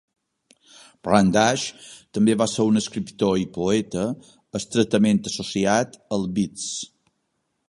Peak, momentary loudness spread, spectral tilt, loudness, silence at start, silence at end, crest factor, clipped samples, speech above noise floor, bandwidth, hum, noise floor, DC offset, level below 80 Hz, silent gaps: -2 dBFS; 13 LU; -5 dB/octave; -22 LUFS; 1.05 s; 0.85 s; 22 dB; under 0.1%; 52 dB; 11.5 kHz; none; -74 dBFS; under 0.1%; -54 dBFS; none